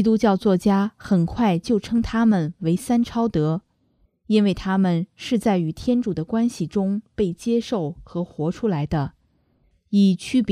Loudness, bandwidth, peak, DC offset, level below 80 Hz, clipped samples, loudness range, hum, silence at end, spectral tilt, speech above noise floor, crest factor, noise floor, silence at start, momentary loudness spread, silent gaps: -22 LUFS; 13.5 kHz; -6 dBFS; under 0.1%; -46 dBFS; under 0.1%; 4 LU; none; 0 s; -7.5 dB/octave; 43 dB; 16 dB; -64 dBFS; 0 s; 7 LU; none